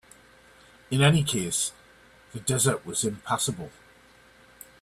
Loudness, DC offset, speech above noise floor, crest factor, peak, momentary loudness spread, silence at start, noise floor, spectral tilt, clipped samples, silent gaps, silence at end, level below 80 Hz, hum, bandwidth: -25 LUFS; under 0.1%; 30 dB; 22 dB; -8 dBFS; 14 LU; 0.9 s; -56 dBFS; -4 dB/octave; under 0.1%; none; 1.1 s; -58 dBFS; none; 14.5 kHz